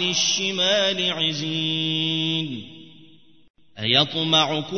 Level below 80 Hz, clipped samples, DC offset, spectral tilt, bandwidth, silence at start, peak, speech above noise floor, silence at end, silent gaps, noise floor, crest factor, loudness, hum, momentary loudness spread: -66 dBFS; under 0.1%; 0.3%; -3 dB/octave; 6.6 kHz; 0 s; -4 dBFS; 30 dB; 0 s; 3.50-3.54 s; -53 dBFS; 20 dB; -21 LUFS; none; 7 LU